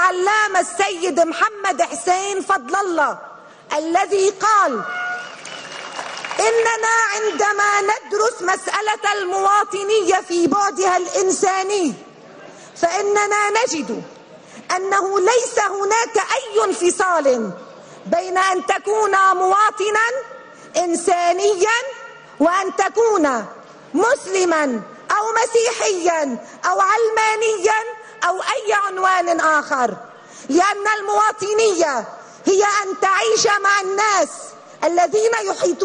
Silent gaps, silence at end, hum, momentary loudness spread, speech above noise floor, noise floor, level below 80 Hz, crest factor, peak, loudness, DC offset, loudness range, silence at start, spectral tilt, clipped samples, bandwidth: none; 0 s; none; 10 LU; 23 dB; -41 dBFS; -66 dBFS; 12 dB; -6 dBFS; -18 LUFS; under 0.1%; 2 LU; 0 s; -2 dB/octave; under 0.1%; 10.5 kHz